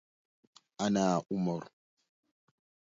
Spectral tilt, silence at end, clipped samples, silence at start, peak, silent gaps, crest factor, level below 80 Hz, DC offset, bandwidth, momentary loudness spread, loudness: -6 dB/octave; 1.3 s; under 0.1%; 0.8 s; -16 dBFS; none; 20 dB; -72 dBFS; under 0.1%; 7.8 kHz; 7 LU; -32 LUFS